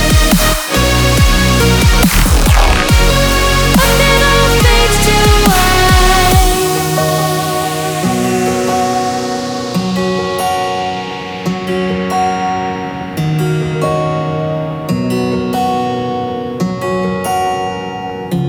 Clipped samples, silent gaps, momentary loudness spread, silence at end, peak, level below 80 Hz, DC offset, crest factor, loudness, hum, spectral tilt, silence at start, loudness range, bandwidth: under 0.1%; none; 10 LU; 0 s; 0 dBFS; -18 dBFS; under 0.1%; 12 dB; -12 LUFS; none; -4.5 dB/octave; 0 s; 7 LU; over 20 kHz